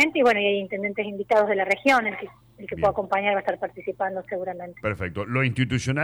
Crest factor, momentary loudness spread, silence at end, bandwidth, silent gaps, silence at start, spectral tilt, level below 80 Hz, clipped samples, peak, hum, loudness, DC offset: 16 dB; 12 LU; 0 s; 19.5 kHz; none; 0 s; -5.5 dB/octave; -54 dBFS; under 0.1%; -8 dBFS; none; -24 LUFS; under 0.1%